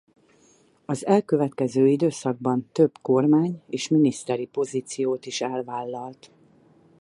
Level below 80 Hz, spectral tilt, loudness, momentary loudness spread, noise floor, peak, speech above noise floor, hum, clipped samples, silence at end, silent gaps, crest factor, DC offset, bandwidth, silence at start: -72 dBFS; -6.5 dB/octave; -24 LUFS; 11 LU; -59 dBFS; -6 dBFS; 36 dB; none; under 0.1%; 0.9 s; none; 18 dB; under 0.1%; 11.5 kHz; 0.9 s